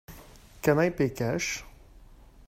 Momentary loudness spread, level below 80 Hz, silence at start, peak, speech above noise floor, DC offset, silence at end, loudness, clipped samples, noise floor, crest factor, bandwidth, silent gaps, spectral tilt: 11 LU; -52 dBFS; 0.1 s; -8 dBFS; 25 dB; under 0.1%; 0.3 s; -28 LUFS; under 0.1%; -52 dBFS; 22 dB; 16 kHz; none; -5.5 dB/octave